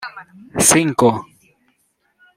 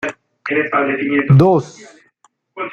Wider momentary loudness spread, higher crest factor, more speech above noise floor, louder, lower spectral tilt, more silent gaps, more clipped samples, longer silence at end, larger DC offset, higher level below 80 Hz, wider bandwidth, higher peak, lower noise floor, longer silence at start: about the same, 17 LU vs 18 LU; first, 20 dB vs 14 dB; first, 48 dB vs 44 dB; about the same, -14 LUFS vs -15 LUFS; second, -3.5 dB/octave vs -8 dB/octave; neither; neither; first, 1.15 s vs 0 s; neither; about the same, -52 dBFS vs -52 dBFS; first, 16.5 kHz vs 7.8 kHz; about the same, 0 dBFS vs -2 dBFS; first, -65 dBFS vs -58 dBFS; about the same, 0 s vs 0 s